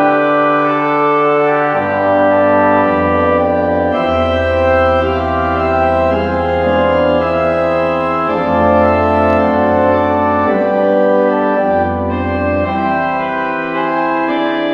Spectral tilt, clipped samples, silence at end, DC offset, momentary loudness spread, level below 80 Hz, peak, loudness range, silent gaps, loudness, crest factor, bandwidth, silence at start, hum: -8 dB/octave; under 0.1%; 0 s; under 0.1%; 4 LU; -34 dBFS; 0 dBFS; 2 LU; none; -13 LUFS; 12 dB; 7 kHz; 0 s; none